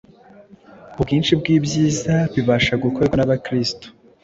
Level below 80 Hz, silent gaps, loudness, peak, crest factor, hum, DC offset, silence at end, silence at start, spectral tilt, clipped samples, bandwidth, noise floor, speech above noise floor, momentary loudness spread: -42 dBFS; none; -19 LUFS; -2 dBFS; 16 dB; none; under 0.1%; 0.35 s; 0.85 s; -5.5 dB/octave; under 0.1%; 7.8 kHz; -46 dBFS; 28 dB; 8 LU